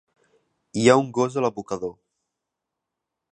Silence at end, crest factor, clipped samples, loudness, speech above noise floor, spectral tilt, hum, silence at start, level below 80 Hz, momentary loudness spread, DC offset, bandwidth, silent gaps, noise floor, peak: 1.4 s; 22 dB; under 0.1%; -22 LUFS; 63 dB; -5.5 dB/octave; none; 0.75 s; -64 dBFS; 15 LU; under 0.1%; 10.5 kHz; none; -84 dBFS; -2 dBFS